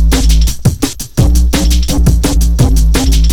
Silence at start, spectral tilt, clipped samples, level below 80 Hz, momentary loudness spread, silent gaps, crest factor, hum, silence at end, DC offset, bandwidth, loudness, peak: 0 s; -5 dB/octave; under 0.1%; -10 dBFS; 3 LU; none; 8 dB; none; 0 s; under 0.1%; 17.5 kHz; -11 LUFS; 0 dBFS